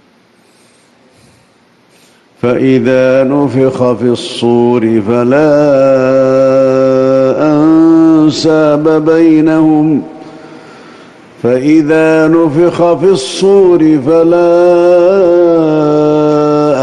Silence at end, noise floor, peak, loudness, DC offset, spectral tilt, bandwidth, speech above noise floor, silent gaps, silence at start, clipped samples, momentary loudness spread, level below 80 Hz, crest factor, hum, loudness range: 0 s; -47 dBFS; 0 dBFS; -8 LUFS; under 0.1%; -7 dB/octave; 10.5 kHz; 40 dB; none; 2.45 s; under 0.1%; 5 LU; -48 dBFS; 8 dB; none; 4 LU